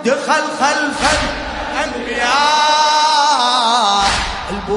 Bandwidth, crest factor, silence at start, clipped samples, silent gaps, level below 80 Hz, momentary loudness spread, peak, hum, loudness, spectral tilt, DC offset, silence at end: 11 kHz; 14 dB; 0 s; under 0.1%; none; -34 dBFS; 9 LU; 0 dBFS; none; -14 LUFS; -2 dB/octave; under 0.1%; 0 s